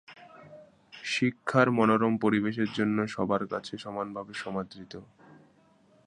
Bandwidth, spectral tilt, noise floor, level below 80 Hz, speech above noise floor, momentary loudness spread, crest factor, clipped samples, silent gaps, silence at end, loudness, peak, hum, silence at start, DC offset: 10 kHz; -6 dB/octave; -62 dBFS; -66 dBFS; 34 dB; 15 LU; 22 dB; under 0.1%; none; 1.05 s; -28 LUFS; -8 dBFS; none; 0.1 s; under 0.1%